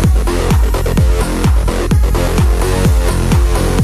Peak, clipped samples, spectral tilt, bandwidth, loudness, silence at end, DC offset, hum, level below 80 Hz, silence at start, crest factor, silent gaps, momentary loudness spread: 0 dBFS; under 0.1%; -6 dB/octave; 15 kHz; -14 LUFS; 0 s; under 0.1%; none; -14 dBFS; 0 s; 10 dB; none; 1 LU